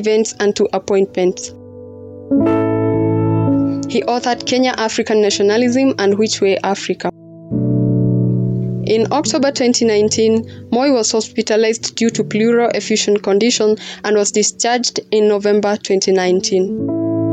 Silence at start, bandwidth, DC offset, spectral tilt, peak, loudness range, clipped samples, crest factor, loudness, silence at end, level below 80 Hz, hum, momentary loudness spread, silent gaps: 0 s; 9.2 kHz; under 0.1%; -4.5 dB/octave; -4 dBFS; 2 LU; under 0.1%; 10 dB; -15 LUFS; 0 s; -48 dBFS; none; 6 LU; none